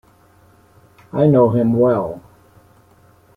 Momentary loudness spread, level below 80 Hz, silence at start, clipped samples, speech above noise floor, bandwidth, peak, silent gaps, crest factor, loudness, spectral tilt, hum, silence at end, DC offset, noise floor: 15 LU; -54 dBFS; 1.15 s; under 0.1%; 37 dB; 4.6 kHz; -2 dBFS; none; 16 dB; -16 LUFS; -11 dB/octave; none; 1.15 s; under 0.1%; -51 dBFS